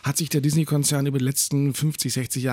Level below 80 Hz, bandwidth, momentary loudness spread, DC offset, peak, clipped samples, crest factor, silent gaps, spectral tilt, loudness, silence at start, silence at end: -60 dBFS; 17 kHz; 3 LU; under 0.1%; -10 dBFS; under 0.1%; 14 dB; none; -4.5 dB/octave; -22 LUFS; 0.05 s; 0 s